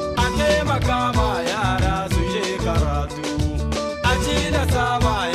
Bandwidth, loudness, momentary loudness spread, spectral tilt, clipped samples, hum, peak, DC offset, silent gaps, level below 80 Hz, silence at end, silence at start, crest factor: 14 kHz; -21 LUFS; 5 LU; -5 dB/octave; under 0.1%; none; -8 dBFS; under 0.1%; none; -28 dBFS; 0 s; 0 s; 12 dB